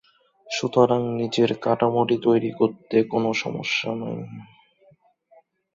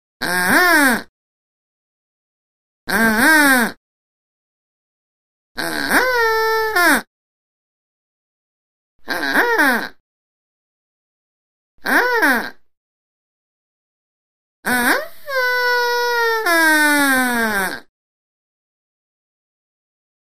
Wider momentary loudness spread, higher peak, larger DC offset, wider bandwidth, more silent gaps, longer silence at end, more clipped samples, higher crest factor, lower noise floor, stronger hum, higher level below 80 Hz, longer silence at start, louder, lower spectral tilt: about the same, 11 LU vs 12 LU; second, -4 dBFS vs 0 dBFS; second, under 0.1% vs 2%; second, 7.8 kHz vs 15.5 kHz; second, none vs 1.09-2.87 s, 3.77-5.55 s, 7.07-8.99 s, 10.00-11.78 s, 12.77-14.63 s; second, 1.3 s vs 2.4 s; neither; about the same, 20 dB vs 20 dB; second, -59 dBFS vs under -90 dBFS; neither; second, -64 dBFS vs -52 dBFS; first, 0.45 s vs 0.2 s; second, -23 LUFS vs -15 LUFS; first, -5.5 dB/octave vs -2 dB/octave